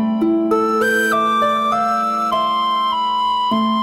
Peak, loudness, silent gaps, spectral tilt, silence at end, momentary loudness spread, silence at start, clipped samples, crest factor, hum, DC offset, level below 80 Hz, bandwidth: -6 dBFS; -17 LUFS; none; -4.5 dB/octave; 0 s; 2 LU; 0 s; under 0.1%; 12 dB; none; 0.1%; -58 dBFS; 16.5 kHz